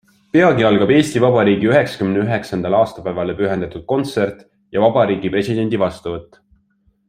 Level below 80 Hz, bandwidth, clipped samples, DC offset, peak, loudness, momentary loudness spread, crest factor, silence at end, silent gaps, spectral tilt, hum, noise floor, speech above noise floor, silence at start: -50 dBFS; 15 kHz; under 0.1%; under 0.1%; 0 dBFS; -16 LUFS; 10 LU; 16 dB; 0.85 s; none; -6.5 dB/octave; none; -60 dBFS; 44 dB; 0.35 s